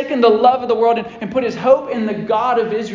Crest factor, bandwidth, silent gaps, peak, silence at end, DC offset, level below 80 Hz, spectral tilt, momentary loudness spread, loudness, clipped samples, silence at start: 14 dB; 7.6 kHz; none; -2 dBFS; 0 s; under 0.1%; -56 dBFS; -6.5 dB/octave; 9 LU; -16 LUFS; under 0.1%; 0 s